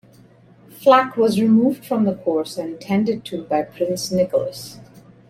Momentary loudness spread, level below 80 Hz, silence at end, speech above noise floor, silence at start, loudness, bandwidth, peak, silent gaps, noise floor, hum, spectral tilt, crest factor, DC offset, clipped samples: 13 LU; -62 dBFS; 0.45 s; 30 dB; 0.8 s; -19 LUFS; 15.5 kHz; -2 dBFS; none; -49 dBFS; none; -6 dB/octave; 18 dB; under 0.1%; under 0.1%